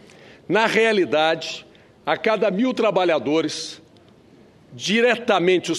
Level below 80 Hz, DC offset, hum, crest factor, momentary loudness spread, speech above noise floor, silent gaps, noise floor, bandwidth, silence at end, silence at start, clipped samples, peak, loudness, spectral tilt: -68 dBFS; under 0.1%; none; 18 dB; 12 LU; 31 dB; none; -51 dBFS; 13 kHz; 0 s; 0.5 s; under 0.1%; -2 dBFS; -20 LUFS; -4 dB/octave